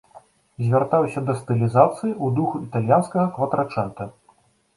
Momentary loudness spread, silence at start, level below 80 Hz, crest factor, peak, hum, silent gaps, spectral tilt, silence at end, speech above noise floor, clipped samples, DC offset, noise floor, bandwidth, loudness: 10 LU; 0.15 s; -58 dBFS; 20 dB; -2 dBFS; none; none; -9 dB/octave; 0.65 s; 39 dB; under 0.1%; under 0.1%; -59 dBFS; 11.5 kHz; -21 LUFS